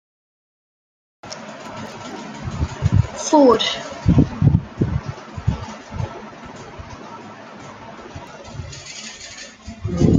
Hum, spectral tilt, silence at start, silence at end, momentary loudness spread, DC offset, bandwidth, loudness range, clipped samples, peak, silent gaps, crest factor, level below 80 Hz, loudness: none; -6 dB/octave; 1.25 s; 0 s; 20 LU; under 0.1%; 9.2 kHz; 16 LU; under 0.1%; -2 dBFS; none; 20 dB; -36 dBFS; -20 LUFS